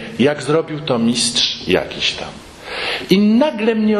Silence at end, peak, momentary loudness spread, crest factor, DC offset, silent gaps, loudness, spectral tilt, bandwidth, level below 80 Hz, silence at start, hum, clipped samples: 0 s; 0 dBFS; 12 LU; 16 dB; under 0.1%; none; -16 LUFS; -4 dB/octave; 13 kHz; -48 dBFS; 0 s; none; under 0.1%